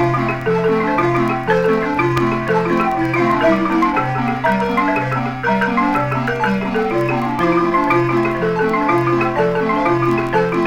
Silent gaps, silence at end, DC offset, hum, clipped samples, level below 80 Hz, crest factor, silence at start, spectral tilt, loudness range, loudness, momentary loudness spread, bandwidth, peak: none; 0 s; under 0.1%; none; under 0.1%; -40 dBFS; 14 dB; 0 s; -7.5 dB/octave; 1 LU; -16 LUFS; 3 LU; 16 kHz; -2 dBFS